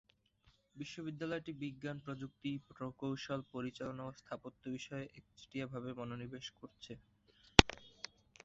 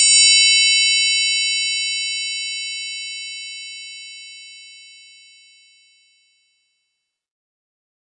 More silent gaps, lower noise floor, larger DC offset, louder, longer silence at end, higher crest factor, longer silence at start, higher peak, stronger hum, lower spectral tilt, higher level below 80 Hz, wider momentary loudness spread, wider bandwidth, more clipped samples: neither; about the same, -73 dBFS vs -76 dBFS; neither; second, -39 LUFS vs -15 LUFS; second, 0.55 s vs 3.3 s; first, 40 dB vs 20 dB; first, 0.75 s vs 0 s; about the same, -2 dBFS vs -2 dBFS; neither; first, -3 dB/octave vs 14 dB/octave; first, -54 dBFS vs under -90 dBFS; second, 15 LU vs 25 LU; second, 7.6 kHz vs 10.5 kHz; neither